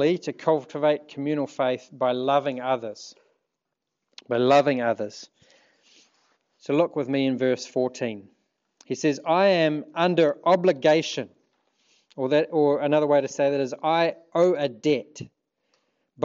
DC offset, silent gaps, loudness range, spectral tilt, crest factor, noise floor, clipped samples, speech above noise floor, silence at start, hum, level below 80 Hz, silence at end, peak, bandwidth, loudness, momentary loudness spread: under 0.1%; none; 5 LU; -5.5 dB/octave; 18 dB; -83 dBFS; under 0.1%; 59 dB; 0 s; none; -78 dBFS; 0 s; -6 dBFS; 7.6 kHz; -24 LUFS; 14 LU